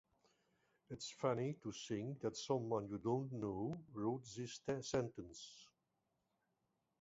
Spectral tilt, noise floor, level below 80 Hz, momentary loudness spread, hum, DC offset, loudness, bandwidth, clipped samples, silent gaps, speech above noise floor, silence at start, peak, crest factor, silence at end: -6 dB/octave; -87 dBFS; -74 dBFS; 13 LU; none; under 0.1%; -44 LUFS; 7.6 kHz; under 0.1%; none; 43 dB; 0.9 s; -24 dBFS; 20 dB; 1.35 s